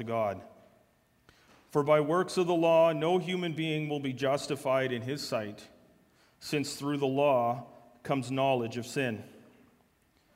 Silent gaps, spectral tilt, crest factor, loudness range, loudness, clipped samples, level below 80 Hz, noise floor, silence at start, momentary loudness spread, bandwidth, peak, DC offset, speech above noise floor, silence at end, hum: none; -5.5 dB/octave; 20 dB; 5 LU; -30 LUFS; under 0.1%; -72 dBFS; -68 dBFS; 0 s; 10 LU; 16 kHz; -12 dBFS; under 0.1%; 39 dB; 1 s; none